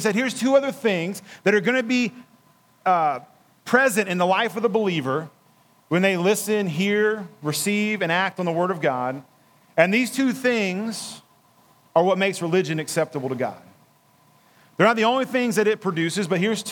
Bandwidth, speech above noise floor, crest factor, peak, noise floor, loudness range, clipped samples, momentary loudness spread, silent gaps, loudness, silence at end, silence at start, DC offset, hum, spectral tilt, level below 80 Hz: 19.5 kHz; 36 dB; 22 dB; -2 dBFS; -58 dBFS; 2 LU; under 0.1%; 9 LU; none; -22 LUFS; 0 s; 0 s; under 0.1%; none; -4.5 dB/octave; -80 dBFS